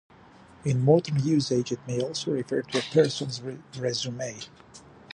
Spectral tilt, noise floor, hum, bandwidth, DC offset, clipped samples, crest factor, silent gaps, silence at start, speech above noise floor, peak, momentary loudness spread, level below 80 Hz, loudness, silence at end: -5.5 dB/octave; -52 dBFS; none; 11 kHz; under 0.1%; under 0.1%; 20 dB; none; 0.65 s; 26 dB; -8 dBFS; 14 LU; -64 dBFS; -27 LUFS; 0 s